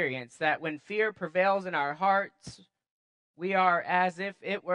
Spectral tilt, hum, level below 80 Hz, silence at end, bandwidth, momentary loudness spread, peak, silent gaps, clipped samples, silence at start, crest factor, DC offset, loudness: -5.5 dB/octave; none; -74 dBFS; 0 s; 10.5 kHz; 12 LU; -10 dBFS; 2.91-3.34 s; under 0.1%; 0 s; 20 dB; under 0.1%; -29 LUFS